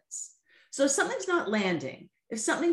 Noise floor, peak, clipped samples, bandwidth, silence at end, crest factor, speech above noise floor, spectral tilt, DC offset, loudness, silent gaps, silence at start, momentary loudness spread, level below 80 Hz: -54 dBFS; -14 dBFS; under 0.1%; 12.5 kHz; 0 s; 16 dB; 26 dB; -3 dB/octave; under 0.1%; -29 LUFS; none; 0.1 s; 15 LU; -78 dBFS